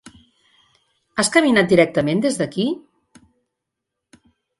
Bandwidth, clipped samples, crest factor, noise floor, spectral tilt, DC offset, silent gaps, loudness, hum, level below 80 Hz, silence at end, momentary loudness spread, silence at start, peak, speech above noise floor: 11.5 kHz; under 0.1%; 20 dB; -81 dBFS; -4.5 dB/octave; under 0.1%; none; -18 LUFS; none; -56 dBFS; 1.8 s; 10 LU; 1.15 s; 0 dBFS; 64 dB